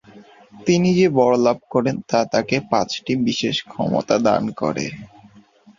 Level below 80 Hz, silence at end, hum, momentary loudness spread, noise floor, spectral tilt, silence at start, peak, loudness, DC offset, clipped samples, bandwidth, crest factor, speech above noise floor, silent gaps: -56 dBFS; 0.7 s; none; 8 LU; -50 dBFS; -5.5 dB/octave; 0.15 s; -2 dBFS; -19 LUFS; under 0.1%; under 0.1%; 7.4 kHz; 18 dB; 31 dB; none